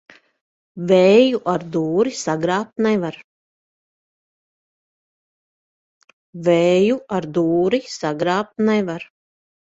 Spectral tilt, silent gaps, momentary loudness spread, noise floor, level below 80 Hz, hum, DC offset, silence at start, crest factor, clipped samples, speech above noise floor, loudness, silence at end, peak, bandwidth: -6 dB/octave; 3.24-6.01 s, 6.13-6.33 s; 9 LU; under -90 dBFS; -62 dBFS; none; under 0.1%; 0.75 s; 18 dB; under 0.1%; over 72 dB; -18 LUFS; 0.7 s; -2 dBFS; 8 kHz